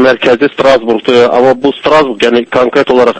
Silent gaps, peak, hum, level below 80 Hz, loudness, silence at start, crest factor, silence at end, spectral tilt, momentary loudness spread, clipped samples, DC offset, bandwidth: none; 0 dBFS; none; -44 dBFS; -8 LUFS; 0 s; 8 dB; 0 s; -5 dB/octave; 2 LU; 2%; under 0.1%; 8.8 kHz